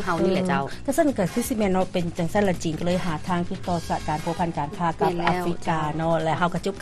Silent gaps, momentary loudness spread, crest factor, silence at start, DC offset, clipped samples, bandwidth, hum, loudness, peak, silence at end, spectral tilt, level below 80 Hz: none; 4 LU; 16 dB; 0 s; under 0.1%; under 0.1%; 13 kHz; none; -25 LUFS; -8 dBFS; 0 s; -6 dB/octave; -42 dBFS